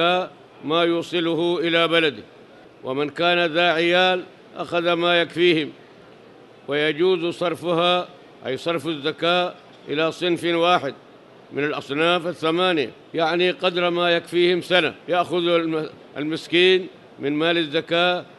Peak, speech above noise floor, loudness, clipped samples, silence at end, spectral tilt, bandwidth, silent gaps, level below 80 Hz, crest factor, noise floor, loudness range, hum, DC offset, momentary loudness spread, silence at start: -4 dBFS; 26 dB; -21 LUFS; under 0.1%; 0.15 s; -5 dB/octave; 12 kHz; none; -70 dBFS; 18 dB; -47 dBFS; 3 LU; none; under 0.1%; 12 LU; 0 s